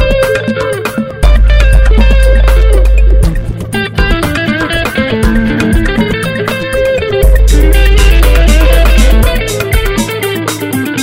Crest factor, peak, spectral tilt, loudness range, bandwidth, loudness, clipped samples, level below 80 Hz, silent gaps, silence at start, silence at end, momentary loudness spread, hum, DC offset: 8 dB; 0 dBFS; -5.5 dB/octave; 3 LU; 16.5 kHz; -10 LUFS; 1%; -8 dBFS; none; 0 s; 0 s; 6 LU; none; under 0.1%